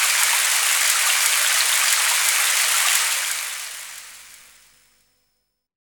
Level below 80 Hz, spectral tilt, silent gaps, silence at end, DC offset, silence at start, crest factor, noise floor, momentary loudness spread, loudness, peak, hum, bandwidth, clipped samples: -72 dBFS; 6 dB/octave; none; 1.6 s; under 0.1%; 0 s; 22 dB; -73 dBFS; 14 LU; -16 LUFS; 0 dBFS; 50 Hz at -70 dBFS; 19.5 kHz; under 0.1%